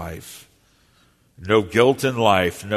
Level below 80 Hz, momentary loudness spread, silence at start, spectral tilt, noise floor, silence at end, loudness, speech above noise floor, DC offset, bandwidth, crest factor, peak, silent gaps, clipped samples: -52 dBFS; 21 LU; 0 s; -5 dB/octave; -59 dBFS; 0 s; -18 LUFS; 39 dB; under 0.1%; 13.5 kHz; 20 dB; -2 dBFS; none; under 0.1%